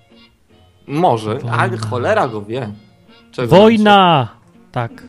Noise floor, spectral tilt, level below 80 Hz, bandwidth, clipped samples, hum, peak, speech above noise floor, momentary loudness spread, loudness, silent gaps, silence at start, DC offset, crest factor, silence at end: -50 dBFS; -6.5 dB/octave; -50 dBFS; 13.5 kHz; under 0.1%; none; 0 dBFS; 37 dB; 17 LU; -14 LUFS; none; 0.9 s; under 0.1%; 16 dB; 0 s